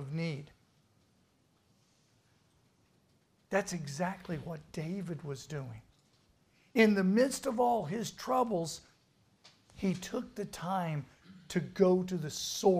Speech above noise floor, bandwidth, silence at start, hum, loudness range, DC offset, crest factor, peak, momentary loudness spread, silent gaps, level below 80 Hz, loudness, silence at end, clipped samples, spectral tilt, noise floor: 39 dB; 15.5 kHz; 0 s; none; 10 LU; under 0.1%; 22 dB; -12 dBFS; 14 LU; none; -66 dBFS; -33 LUFS; 0 s; under 0.1%; -5.5 dB/octave; -71 dBFS